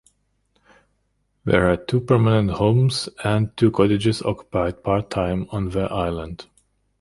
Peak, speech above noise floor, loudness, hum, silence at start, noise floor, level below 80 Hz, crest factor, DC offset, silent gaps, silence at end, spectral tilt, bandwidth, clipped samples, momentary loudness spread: -2 dBFS; 49 dB; -21 LUFS; 50 Hz at -45 dBFS; 1.45 s; -69 dBFS; -42 dBFS; 18 dB; under 0.1%; none; 0.6 s; -7 dB/octave; 11.5 kHz; under 0.1%; 8 LU